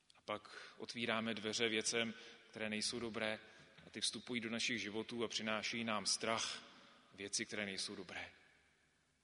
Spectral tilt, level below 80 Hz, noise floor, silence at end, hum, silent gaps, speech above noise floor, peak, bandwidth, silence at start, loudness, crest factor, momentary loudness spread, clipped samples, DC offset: -2 dB/octave; -80 dBFS; -77 dBFS; 0.9 s; none; none; 35 dB; -20 dBFS; 10.5 kHz; 0.3 s; -41 LUFS; 22 dB; 16 LU; under 0.1%; under 0.1%